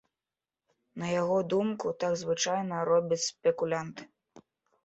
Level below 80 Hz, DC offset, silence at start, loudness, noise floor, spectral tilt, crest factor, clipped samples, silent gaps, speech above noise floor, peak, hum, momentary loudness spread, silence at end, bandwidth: -72 dBFS; under 0.1%; 0.95 s; -30 LUFS; under -90 dBFS; -4.5 dB/octave; 18 dB; under 0.1%; none; over 60 dB; -14 dBFS; none; 10 LU; 0.45 s; 8.2 kHz